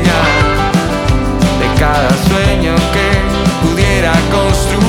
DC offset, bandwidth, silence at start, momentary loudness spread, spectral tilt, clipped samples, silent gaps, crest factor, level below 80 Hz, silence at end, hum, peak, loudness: under 0.1%; 17 kHz; 0 s; 3 LU; -5.5 dB/octave; under 0.1%; none; 10 dB; -18 dBFS; 0 s; none; 0 dBFS; -11 LUFS